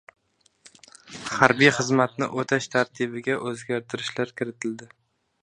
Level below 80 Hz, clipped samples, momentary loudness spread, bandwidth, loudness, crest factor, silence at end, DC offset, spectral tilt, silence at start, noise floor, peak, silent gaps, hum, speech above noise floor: -66 dBFS; under 0.1%; 15 LU; 10.5 kHz; -24 LUFS; 26 dB; 0.55 s; under 0.1%; -4.5 dB/octave; 1.1 s; -61 dBFS; 0 dBFS; none; none; 37 dB